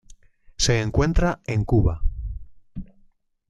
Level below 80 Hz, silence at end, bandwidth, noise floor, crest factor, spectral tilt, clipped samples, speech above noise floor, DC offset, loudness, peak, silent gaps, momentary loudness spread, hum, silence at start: -30 dBFS; 0.65 s; 12 kHz; -58 dBFS; 16 dB; -5 dB/octave; under 0.1%; 38 dB; under 0.1%; -23 LUFS; -8 dBFS; none; 20 LU; none; 0.6 s